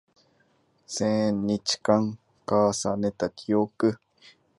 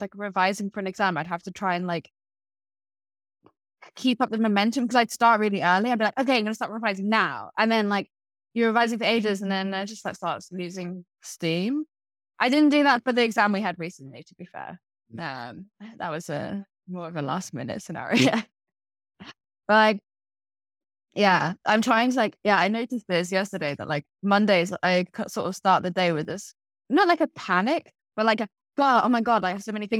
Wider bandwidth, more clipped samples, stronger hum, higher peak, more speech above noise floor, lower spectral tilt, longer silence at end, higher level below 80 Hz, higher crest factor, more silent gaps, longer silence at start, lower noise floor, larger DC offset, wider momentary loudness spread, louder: second, 11.5 kHz vs 15 kHz; neither; neither; about the same, -6 dBFS vs -6 dBFS; second, 41 dB vs over 66 dB; about the same, -5 dB/octave vs -5 dB/octave; first, 0.65 s vs 0 s; first, -60 dBFS vs -72 dBFS; about the same, 22 dB vs 20 dB; neither; first, 0.9 s vs 0 s; second, -66 dBFS vs under -90 dBFS; neither; second, 9 LU vs 16 LU; about the same, -26 LUFS vs -24 LUFS